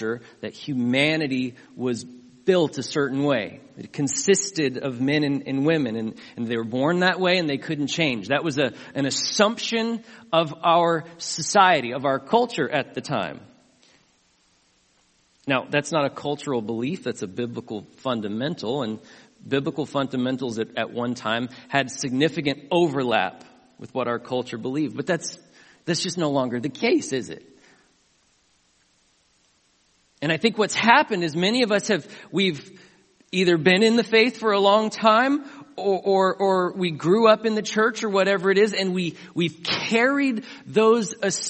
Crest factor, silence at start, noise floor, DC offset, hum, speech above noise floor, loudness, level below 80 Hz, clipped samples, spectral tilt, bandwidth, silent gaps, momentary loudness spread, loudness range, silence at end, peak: 24 dB; 0 s; -64 dBFS; under 0.1%; none; 41 dB; -23 LUFS; -68 dBFS; under 0.1%; -4 dB/octave; 8.8 kHz; none; 12 LU; 8 LU; 0 s; 0 dBFS